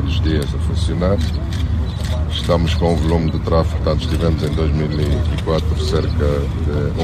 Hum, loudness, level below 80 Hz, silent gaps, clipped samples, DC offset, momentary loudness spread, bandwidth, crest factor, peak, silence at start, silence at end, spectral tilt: none; -18 LUFS; -24 dBFS; none; under 0.1%; under 0.1%; 4 LU; 13.5 kHz; 16 dB; 0 dBFS; 0 s; 0 s; -7 dB/octave